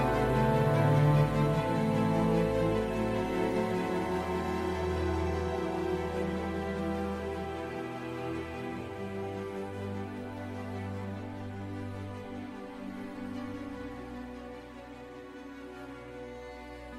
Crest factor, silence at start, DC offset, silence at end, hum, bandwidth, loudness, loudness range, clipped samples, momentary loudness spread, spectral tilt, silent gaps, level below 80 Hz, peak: 18 dB; 0 s; under 0.1%; 0 s; none; 15 kHz; -32 LUFS; 14 LU; under 0.1%; 18 LU; -7.5 dB/octave; none; -48 dBFS; -14 dBFS